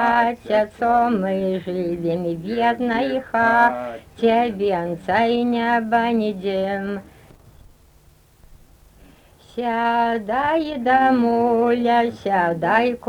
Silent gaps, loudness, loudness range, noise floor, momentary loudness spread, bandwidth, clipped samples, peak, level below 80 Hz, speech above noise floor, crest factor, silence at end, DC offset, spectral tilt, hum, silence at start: none; -20 LUFS; 8 LU; -53 dBFS; 7 LU; 12.5 kHz; under 0.1%; -4 dBFS; -52 dBFS; 33 dB; 16 dB; 0 s; under 0.1%; -7 dB/octave; none; 0 s